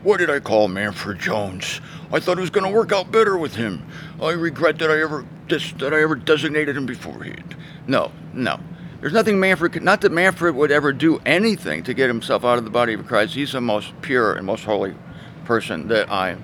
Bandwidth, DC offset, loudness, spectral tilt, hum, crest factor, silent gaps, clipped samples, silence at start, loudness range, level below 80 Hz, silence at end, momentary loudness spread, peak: 17 kHz; under 0.1%; -20 LUFS; -5 dB/octave; none; 18 dB; none; under 0.1%; 0 s; 4 LU; -54 dBFS; 0 s; 12 LU; -2 dBFS